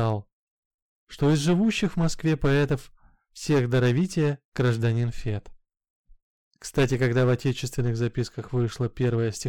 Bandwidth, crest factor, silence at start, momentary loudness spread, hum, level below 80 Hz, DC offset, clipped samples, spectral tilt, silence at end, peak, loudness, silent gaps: 13.5 kHz; 14 dB; 0 s; 9 LU; none; -44 dBFS; under 0.1%; under 0.1%; -6.5 dB/octave; 0 s; -12 dBFS; -25 LUFS; 0.33-1.07 s, 4.45-4.52 s, 5.90-6.04 s, 6.22-6.51 s